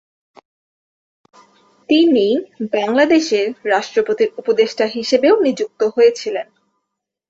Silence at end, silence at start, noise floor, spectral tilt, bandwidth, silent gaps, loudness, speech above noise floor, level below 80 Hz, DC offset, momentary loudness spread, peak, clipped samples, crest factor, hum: 0.85 s; 1.9 s; -78 dBFS; -4 dB/octave; 8 kHz; none; -16 LUFS; 63 dB; -64 dBFS; under 0.1%; 8 LU; -2 dBFS; under 0.1%; 16 dB; none